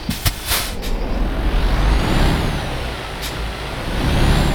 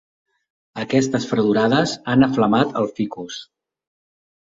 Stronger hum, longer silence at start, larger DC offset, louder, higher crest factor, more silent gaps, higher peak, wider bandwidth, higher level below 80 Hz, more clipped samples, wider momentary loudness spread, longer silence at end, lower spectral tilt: neither; second, 0 s vs 0.75 s; neither; about the same, -21 LUFS vs -19 LUFS; about the same, 14 dB vs 18 dB; neither; about the same, -4 dBFS vs -4 dBFS; first, over 20 kHz vs 7.8 kHz; first, -20 dBFS vs -56 dBFS; neither; second, 8 LU vs 15 LU; second, 0 s vs 1.05 s; about the same, -4.5 dB/octave vs -5.5 dB/octave